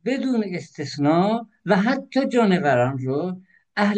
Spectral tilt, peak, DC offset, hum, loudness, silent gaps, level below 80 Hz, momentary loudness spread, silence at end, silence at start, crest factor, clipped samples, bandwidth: -7 dB/octave; -6 dBFS; under 0.1%; none; -22 LUFS; none; -68 dBFS; 12 LU; 0 s; 0.05 s; 16 dB; under 0.1%; 9 kHz